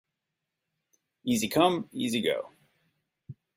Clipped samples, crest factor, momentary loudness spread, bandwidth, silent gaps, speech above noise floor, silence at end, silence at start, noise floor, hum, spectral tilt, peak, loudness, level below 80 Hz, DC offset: under 0.1%; 22 dB; 12 LU; 16 kHz; none; 58 dB; 0.25 s; 1.25 s; -85 dBFS; none; -4 dB/octave; -8 dBFS; -28 LUFS; -68 dBFS; under 0.1%